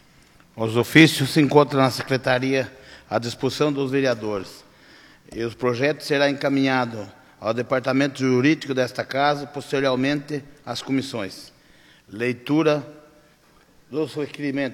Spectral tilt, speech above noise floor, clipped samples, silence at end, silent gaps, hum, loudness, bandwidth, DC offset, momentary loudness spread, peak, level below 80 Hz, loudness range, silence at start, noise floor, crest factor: -5.5 dB/octave; 34 dB; under 0.1%; 0 s; none; none; -22 LUFS; 16.5 kHz; under 0.1%; 15 LU; 0 dBFS; -60 dBFS; 7 LU; 0.55 s; -56 dBFS; 22 dB